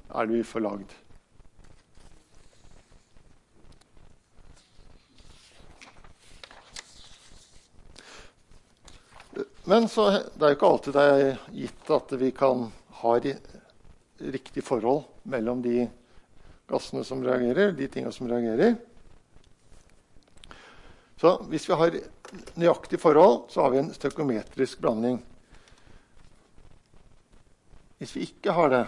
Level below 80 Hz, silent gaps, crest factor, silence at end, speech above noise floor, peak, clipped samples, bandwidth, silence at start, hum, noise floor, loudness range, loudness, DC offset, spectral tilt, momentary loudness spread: -56 dBFS; none; 22 dB; 0 s; 32 dB; -6 dBFS; under 0.1%; 11.5 kHz; 0.1 s; none; -57 dBFS; 11 LU; -25 LUFS; under 0.1%; -6 dB/octave; 19 LU